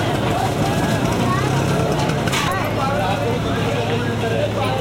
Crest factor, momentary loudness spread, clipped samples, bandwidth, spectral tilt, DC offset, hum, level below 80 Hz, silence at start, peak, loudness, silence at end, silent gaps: 12 dB; 2 LU; under 0.1%; 16.5 kHz; -5.5 dB/octave; under 0.1%; none; -36 dBFS; 0 s; -6 dBFS; -19 LUFS; 0 s; none